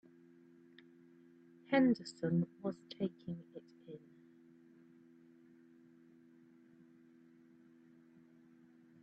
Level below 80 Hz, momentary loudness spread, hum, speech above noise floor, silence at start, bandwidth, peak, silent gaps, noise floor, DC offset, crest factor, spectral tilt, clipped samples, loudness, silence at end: -82 dBFS; 30 LU; none; 28 dB; 1.7 s; 8 kHz; -18 dBFS; none; -64 dBFS; under 0.1%; 26 dB; -6.5 dB/octave; under 0.1%; -37 LUFS; 5.05 s